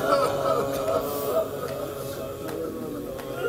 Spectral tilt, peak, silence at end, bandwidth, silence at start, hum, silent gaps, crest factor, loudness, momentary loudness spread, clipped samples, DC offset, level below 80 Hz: -5 dB/octave; -8 dBFS; 0 s; 16 kHz; 0 s; none; none; 18 dB; -28 LUFS; 10 LU; under 0.1%; under 0.1%; -52 dBFS